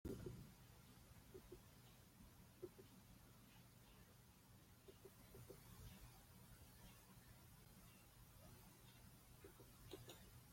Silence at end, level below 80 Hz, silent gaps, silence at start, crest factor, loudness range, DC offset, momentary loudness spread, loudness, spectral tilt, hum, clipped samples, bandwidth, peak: 0 s; -72 dBFS; none; 0.05 s; 22 dB; 1 LU; under 0.1%; 7 LU; -64 LUFS; -5 dB/octave; none; under 0.1%; 16.5 kHz; -40 dBFS